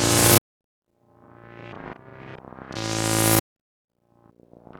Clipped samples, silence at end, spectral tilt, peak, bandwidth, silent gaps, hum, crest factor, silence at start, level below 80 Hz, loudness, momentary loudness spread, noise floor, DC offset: under 0.1%; 1.4 s; -3 dB/octave; -4 dBFS; over 20 kHz; 0.41-0.82 s; none; 22 dB; 0 s; -48 dBFS; -20 LUFS; 26 LU; -59 dBFS; under 0.1%